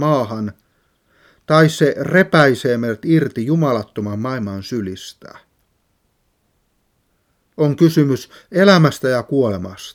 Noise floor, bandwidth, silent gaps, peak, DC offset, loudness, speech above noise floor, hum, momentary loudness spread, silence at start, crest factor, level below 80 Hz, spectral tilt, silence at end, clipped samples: -65 dBFS; 16 kHz; none; 0 dBFS; under 0.1%; -16 LUFS; 49 dB; none; 13 LU; 0 s; 18 dB; -60 dBFS; -6.5 dB/octave; 0.05 s; under 0.1%